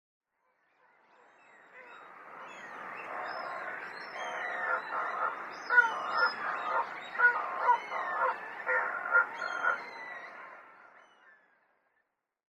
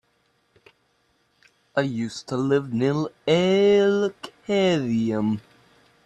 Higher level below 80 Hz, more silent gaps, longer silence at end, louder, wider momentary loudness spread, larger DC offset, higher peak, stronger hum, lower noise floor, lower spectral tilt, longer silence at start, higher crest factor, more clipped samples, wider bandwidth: second, under -90 dBFS vs -62 dBFS; neither; first, 1.2 s vs 0.65 s; second, -31 LUFS vs -23 LUFS; first, 21 LU vs 11 LU; neither; second, -12 dBFS vs -8 dBFS; neither; first, -80 dBFS vs -67 dBFS; second, -2 dB/octave vs -6.5 dB/octave; second, 1.55 s vs 1.75 s; first, 24 dB vs 16 dB; neither; about the same, 9.8 kHz vs 9.6 kHz